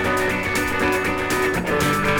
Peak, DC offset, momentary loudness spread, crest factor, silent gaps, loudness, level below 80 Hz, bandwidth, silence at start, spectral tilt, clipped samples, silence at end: -8 dBFS; under 0.1%; 1 LU; 14 dB; none; -20 LUFS; -38 dBFS; over 20 kHz; 0 s; -4.5 dB/octave; under 0.1%; 0 s